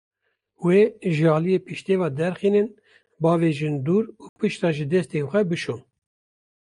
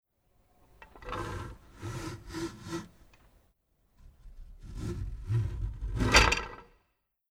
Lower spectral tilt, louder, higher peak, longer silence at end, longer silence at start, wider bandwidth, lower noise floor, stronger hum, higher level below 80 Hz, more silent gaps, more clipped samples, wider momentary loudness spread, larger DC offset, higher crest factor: first, -7.5 dB/octave vs -3.5 dB/octave; first, -23 LUFS vs -31 LUFS; about the same, -6 dBFS vs -6 dBFS; first, 0.95 s vs 0.65 s; second, 0.6 s vs 0.8 s; second, 11 kHz vs 17 kHz; second, -64 dBFS vs -77 dBFS; neither; second, -66 dBFS vs -42 dBFS; first, 4.29-4.36 s vs none; neither; second, 9 LU vs 24 LU; neither; second, 16 dB vs 28 dB